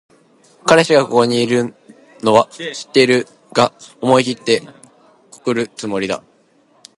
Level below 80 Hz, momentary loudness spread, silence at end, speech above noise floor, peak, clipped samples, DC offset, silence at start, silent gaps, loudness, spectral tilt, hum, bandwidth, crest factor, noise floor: -60 dBFS; 10 LU; 0.8 s; 39 dB; 0 dBFS; under 0.1%; under 0.1%; 0.65 s; none; -16 LUFS; -4.5 dB/octave; none; 11.5 kHz; 18 dB; -54 dBFS